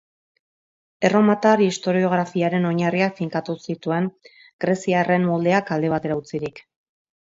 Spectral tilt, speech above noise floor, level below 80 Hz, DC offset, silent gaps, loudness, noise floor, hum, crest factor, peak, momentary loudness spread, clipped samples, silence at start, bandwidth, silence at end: -6.5 dB/octave; over 70 dB; -62 dBFS; under 0.1%; 4.53-4.59 s; -21 LUFS; under -90 dBFS; none; 18 dB; -2 dBFS; 11 LU; under 0.1%; 1 s; 7.8 kHz; 0.7 s